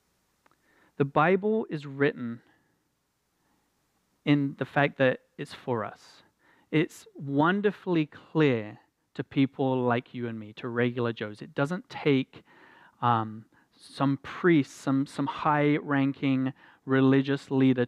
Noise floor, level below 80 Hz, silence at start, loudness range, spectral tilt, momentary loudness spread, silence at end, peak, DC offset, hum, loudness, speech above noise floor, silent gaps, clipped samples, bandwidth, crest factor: -75 dBFS; -72 dBFS; 1 s; 4 LU; -7.5 dB/octave; 14 LU; 0 s; -8 dBFS; under 0.1%; none; -28 LUFS; 49 dB; none; under 0.1%; 11 kHz; 20 dB